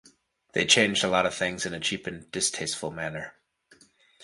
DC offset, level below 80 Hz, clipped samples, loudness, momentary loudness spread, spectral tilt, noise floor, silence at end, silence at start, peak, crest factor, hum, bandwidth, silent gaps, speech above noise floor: under 0.1%; -60 dBFS; under 0.1%; -26 LUFS; 15 LU; -2 dB/octave; -61 dBFS; 0 s; 0.55 s; -4 dBFS; 24 dB; none; 11.5 kHz; none; 34 dB